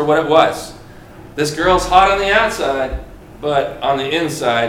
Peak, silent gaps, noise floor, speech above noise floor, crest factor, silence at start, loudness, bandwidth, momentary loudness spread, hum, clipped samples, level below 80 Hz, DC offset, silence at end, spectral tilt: 0 dBFS; none; -37 dBFS; 22 dB; 16 dB; 0 s; -15 LUFS; 17 kHz; 14 LU; none; under 0.1%; -34 dBFS; under 0.1%; 0 s; -4 dB/octave